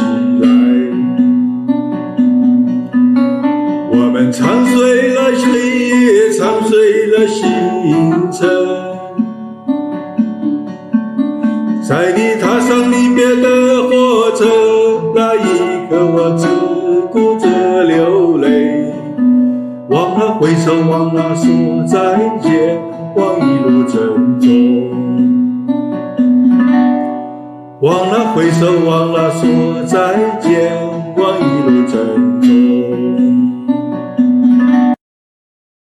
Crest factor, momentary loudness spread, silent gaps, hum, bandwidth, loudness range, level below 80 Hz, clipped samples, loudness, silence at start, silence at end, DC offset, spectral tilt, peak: 10 dB; 8 LU; none; none; 12 kHz; 3 LU; -56 dBFS; under 0.1%; -12 LUFS; 0 s; 0.85 s; under 0.1%; -6.5 dB/octave; 0 dBFS